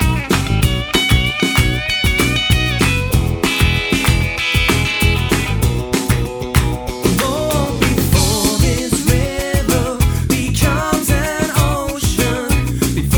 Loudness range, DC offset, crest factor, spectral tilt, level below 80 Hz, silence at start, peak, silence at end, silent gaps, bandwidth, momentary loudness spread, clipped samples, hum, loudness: 2 LU; under 0.1%; 14 dB; -4.5 dB/octave; -22 dBFS; 0 s; 0 dBFS; 0 s; none; over 20 kHz; 4 LU; under 0.1%; none; -15 LUFS